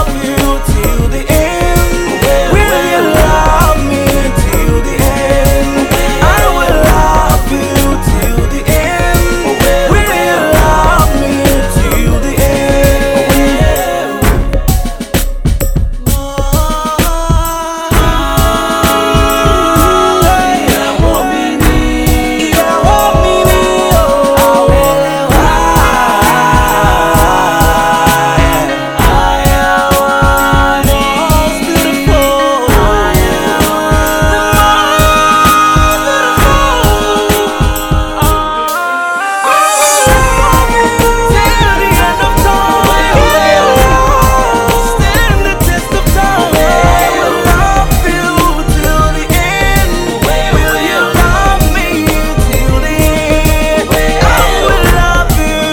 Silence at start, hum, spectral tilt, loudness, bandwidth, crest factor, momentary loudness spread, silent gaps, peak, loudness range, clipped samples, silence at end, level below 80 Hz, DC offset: 0 s; none; -4.5 dB/octave; -9 LUFS; over 20 kHz; 8 dB; 5 LU; none; 0 dBFS; 3 LU; 2%; 0 s; -14 dBFS; under 0.1%